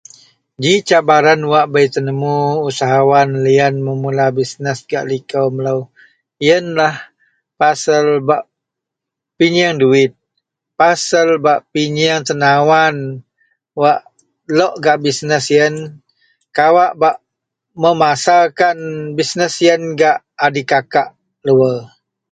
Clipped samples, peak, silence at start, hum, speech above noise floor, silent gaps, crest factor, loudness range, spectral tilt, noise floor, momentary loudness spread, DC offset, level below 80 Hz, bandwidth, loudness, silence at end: under 0.1%; 0 dBFS; 0.6 s; none; 68 dB; none; 14 dB; 3 LU; -4.5 dB/octave; -81 dBFS; 9 LU; under 0.1%; -60 dBFS; 9.4 kHz; -14 LUFS; 0.45 s